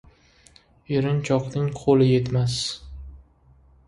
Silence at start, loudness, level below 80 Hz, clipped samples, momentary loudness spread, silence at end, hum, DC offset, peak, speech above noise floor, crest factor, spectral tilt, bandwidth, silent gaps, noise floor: 0.9 s; -22 LUFS; -46 dBFS; under 0.1%; 16 LU; 0.7 s; none; under 0.1%; -6 dBFS; 34 dB; 18 dB; -6.5 dB/octave; 11.5 kHz; none; -55 dBFS